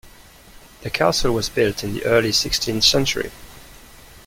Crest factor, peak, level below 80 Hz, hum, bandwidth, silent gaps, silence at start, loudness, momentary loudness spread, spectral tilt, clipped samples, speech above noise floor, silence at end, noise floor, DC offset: 20 dB; -2 dBFS; -40 dBFS; none; 16.5 kHz; none; 0.05 s; -19 LUFS; 11 LU; -3 dB/octave; under 0.1%; 26 dB; 0.1 s; -45 dBFS; under 0.1%